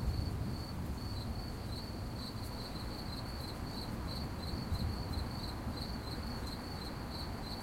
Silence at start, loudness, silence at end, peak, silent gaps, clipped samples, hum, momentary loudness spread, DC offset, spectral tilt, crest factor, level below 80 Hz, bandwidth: 0 s; -41 LUFS; 0 s; -24 dBFS; none; under 0.1%; none; 4 LU; under 0.1%; -5.5 dB/octave; 16 dB; -46 dBFS; 16.5 kHz